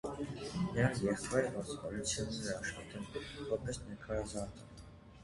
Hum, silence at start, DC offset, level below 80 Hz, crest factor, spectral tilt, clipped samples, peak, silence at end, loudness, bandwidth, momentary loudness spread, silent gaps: none; 0.05 s; under 0.1%; -56 dBFS; 22 dB; -4.5 dB/octave; under 0.1%; -16 dBFS; 0 s; -39 LUFS; 11.5 kHz; 13 LU; none